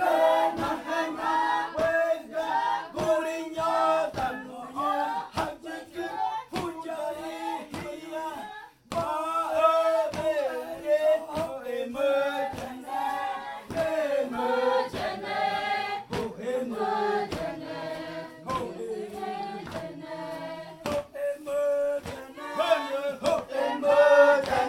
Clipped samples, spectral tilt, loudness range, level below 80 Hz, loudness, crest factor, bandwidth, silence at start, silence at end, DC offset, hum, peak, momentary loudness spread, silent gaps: under 0.1%; -4.5 dB/octave; 8 LU; -60 dBFS; -28 LUFS; 20 dB; 16.5 kHz; 0 s; 0 s; under 0.1%; none; -6 dBFS; 13 LU; none